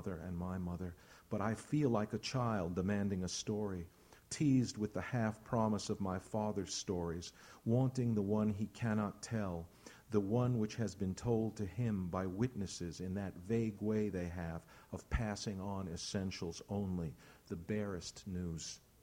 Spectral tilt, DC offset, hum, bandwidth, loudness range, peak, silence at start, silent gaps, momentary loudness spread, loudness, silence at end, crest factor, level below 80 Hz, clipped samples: -6 dB/octave; under 0.1%; none; 16.5 kHz; 4 LU; -20 dBFS; 0 s; none; 11 LU; -39 LUFS; 0.25 s; 18 dB; -58 dBFS; under 0.1%